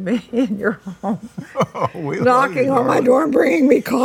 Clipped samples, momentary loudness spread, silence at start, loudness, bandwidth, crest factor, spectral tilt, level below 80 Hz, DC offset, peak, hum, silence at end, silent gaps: under 0.1%; 11 LU; 0 s; -17 LUFS; 17.5 kHz; 16 dB; -6.5 dB/octave; -58 dBFS; under 0.1%; 0 dBFS; none; 0 s; none